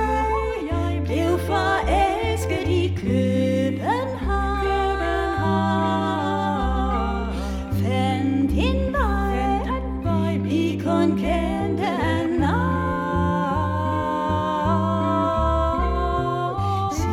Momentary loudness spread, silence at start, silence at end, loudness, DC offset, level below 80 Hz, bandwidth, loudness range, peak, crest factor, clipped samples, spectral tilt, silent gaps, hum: 4 LU; 0 s; 0 s; -22 LUFS; under 0.1%; -30 dBFS; 15 kHz; 1 LU; -8 dBFS; 12 dB; under 0.1%; -7 dB/octave; none; none